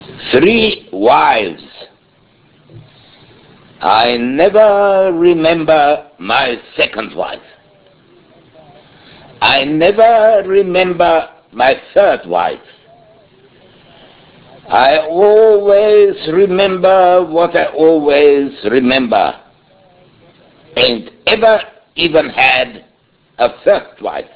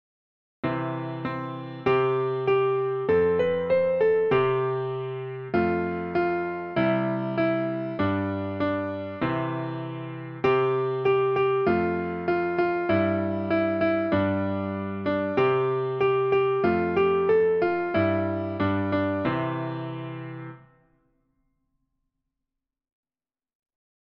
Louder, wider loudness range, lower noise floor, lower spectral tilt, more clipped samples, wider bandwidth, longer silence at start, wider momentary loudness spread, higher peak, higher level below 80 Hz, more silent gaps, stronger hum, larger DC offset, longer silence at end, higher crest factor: first, -11 LUFS vs -25 LUFS; about the same, 7 LU vs 5 LU; second, -53 dBFS vs under -90 dBFS; about the same, -8.5 dB/octave vs -9.5 dB/octave; first, 0.3% vs under 0.1%; second, 4 kHz vs 5.6 kHz; second, 0 s vs 0.65 s; about the same, 11 LU vs 10 LU; first, 0 dBFS vs -10 dBFS; first, -48 dBFS vs -58 dBFS; neither; neither; neither; second, 0.1 s vs 3.5 s; about the same, 12 dB vs 14 dB